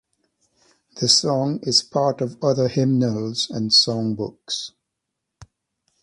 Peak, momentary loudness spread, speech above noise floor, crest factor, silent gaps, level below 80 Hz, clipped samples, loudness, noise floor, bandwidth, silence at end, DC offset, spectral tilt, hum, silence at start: 0 dBFS; 12 LU; 60 dB; 22 dB; none; -60 dBFS; under 0.1%; -20 LUFS; -80 dBFS; 11.5 kHz; 0.6 s; under 0.1%; -4.5 dB/octave; none; 0.95 s